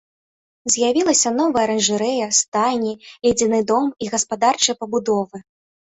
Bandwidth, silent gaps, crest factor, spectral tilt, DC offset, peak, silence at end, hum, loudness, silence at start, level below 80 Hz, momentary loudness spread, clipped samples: 8.4 kHz; 2.48-2.52 s; 18 dB; -2.5 dB/octave; under 0.1%; -2 dBFS; 0.55 s; none; -18 LUFS; 0.65 s; -58 dBFS; 7 LU; under 0.1%